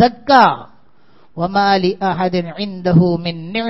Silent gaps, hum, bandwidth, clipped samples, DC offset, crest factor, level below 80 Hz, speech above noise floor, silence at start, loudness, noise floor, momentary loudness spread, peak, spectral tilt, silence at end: none; none; 6 kHz; under 0.1%; 0.7%; 16 dB; -48 dBFS; 38 dB; 0 s; -15 LUFS; -53 dBFS; 13 LU; 0 dBFS; -7.5 dB/octave; 0 s